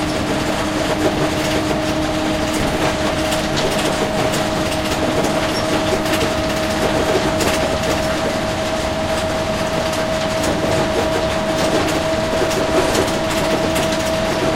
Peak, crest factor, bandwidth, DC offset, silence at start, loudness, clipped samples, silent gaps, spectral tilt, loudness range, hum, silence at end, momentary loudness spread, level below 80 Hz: -2 dBFS; 16 dB; 16 kHz; under 0.1%; 0 s; -18 LUFS; under 0.1%; none; -4.5 dB/octave; 1 LU; none; 0 s; 2 LU; -34 dBFS